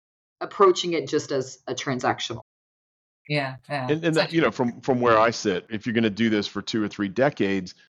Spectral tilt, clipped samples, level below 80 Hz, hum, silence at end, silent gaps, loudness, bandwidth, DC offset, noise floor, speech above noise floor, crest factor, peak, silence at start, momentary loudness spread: -5 dB/octave; under 0.1%; -64 dBFS; none; 0.15 s; 2.42-3.25 s; -24 LUFS; 10.5 kHz; under 0.1%; under -90 dBFS; over 66 dB; 18 dB; -6 dBFS; 0.4 s; 11 LU